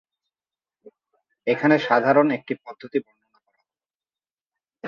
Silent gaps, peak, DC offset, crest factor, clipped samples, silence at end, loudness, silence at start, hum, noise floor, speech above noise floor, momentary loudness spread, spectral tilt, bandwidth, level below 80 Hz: 3.95-4.00 s, 4.31-4.50 s; -4 dBFS; under 0.1%; 20 dB; under 0.1%; 0 s; -22 LUFS; 1.45 s; none; under -90 dBFS; over 69 dB; 13 LU; -7.5 dB/octave; 7 kHz; -74 dBFS